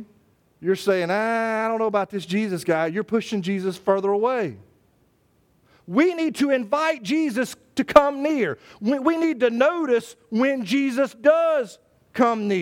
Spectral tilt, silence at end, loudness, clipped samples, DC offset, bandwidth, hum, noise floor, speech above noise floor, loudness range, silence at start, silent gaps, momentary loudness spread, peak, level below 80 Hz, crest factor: -5.5 dB/octave; 0 s; -22 LUFS; under 0.1%; under 0.1%; 17 kHz; none; -63 dBFS; 41 dB; 4 LU; 0 s; none; 8 LU; 0 dBFS; -60 dBFS; 22 dB